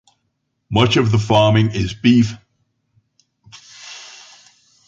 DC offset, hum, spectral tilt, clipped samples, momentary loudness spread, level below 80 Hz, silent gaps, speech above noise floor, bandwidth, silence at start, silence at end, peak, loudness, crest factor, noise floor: under 0.1%; none; -6.5 dB/octave; under 0.1%; 22 LU; -44 dBFS; none; 57 dB; 7.8 kHz; 0.7 s; 0.8 s; -2 dBFS; -15 LUFS; 18 dB; -71 dBFS